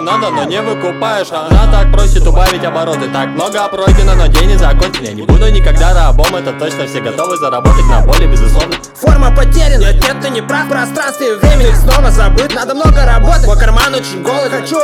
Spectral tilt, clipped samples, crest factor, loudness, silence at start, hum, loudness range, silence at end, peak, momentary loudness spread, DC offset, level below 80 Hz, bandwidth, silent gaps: -5 dB/octave; 2%; 8 dB; -11 LUFS; 0 s; none; 2 LU; 0 s; 0 dBFS; 6 LU; under 0.1%; -8 dBFS; 14.5 kHz; none